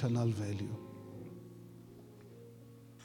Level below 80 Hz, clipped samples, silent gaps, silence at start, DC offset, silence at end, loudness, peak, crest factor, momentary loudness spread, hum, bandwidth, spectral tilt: -74 dBFS; under 0.1%; none; 0 s; under 0.1%; 0 s; -39 LUFS; -22 dBFS; 18 dB; 21 LU; none; 14 kHz; -7.5 dB/octave